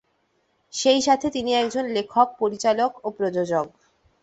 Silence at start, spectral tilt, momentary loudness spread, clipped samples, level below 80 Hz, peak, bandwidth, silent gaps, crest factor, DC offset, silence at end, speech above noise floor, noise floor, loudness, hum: 0.75 s; -3.5 dB/octave; 7 LU; under 0.1%; -62 dBFS; -4 dBFS; 8.2 kHz; none; 18 dB; under 0.1%; 0.55 s; 46 dB; -68 dBFS; -22 LUFS; none